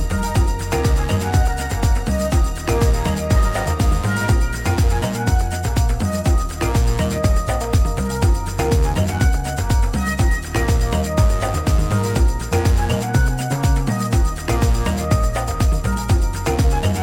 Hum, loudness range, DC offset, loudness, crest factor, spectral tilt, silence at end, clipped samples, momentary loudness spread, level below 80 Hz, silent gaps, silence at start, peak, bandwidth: none; 1 LU; under 0.1%; -19 LUFS; 14 dB; -5.5 dB/octave; 0 s; under 0.1%; 2 LU; -20 dBFS; none; 0 s; -2 dBFS; 17 kHz